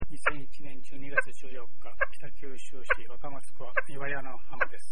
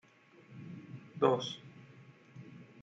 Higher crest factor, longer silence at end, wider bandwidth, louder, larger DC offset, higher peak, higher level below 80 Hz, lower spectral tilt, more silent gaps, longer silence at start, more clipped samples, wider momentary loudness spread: about the same, 26 dB vs 24 dB; about the same, 0 s vs 0 s; first, 10 kHz vs 7.8 kHz; about the same, -33 LUFS vs -34 LUFS; first, 9% vs under 0.1%; first, -8 dBFS vs -14 dBFS; first, -52 dBFS vs -82 dBFS; second, -4.5 dB/octave vs -6 dB/octave; neither; second, 0 s vs 0.4 s; neither; second, 18 LU vs 25 LU